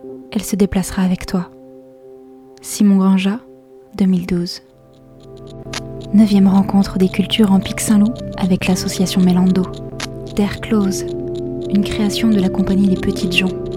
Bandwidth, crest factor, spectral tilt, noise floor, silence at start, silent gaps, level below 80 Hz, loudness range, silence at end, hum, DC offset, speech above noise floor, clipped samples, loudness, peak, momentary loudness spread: 15.5 kHz; 16 dB; -6 dB/octave; -44 dBFS; 0 s; none; -38 dBFS; 4 LU; 0 s; none; under 0.1%; 29 dB; under 0.1%; -16 LUFS; 0 dBFS; 14 LU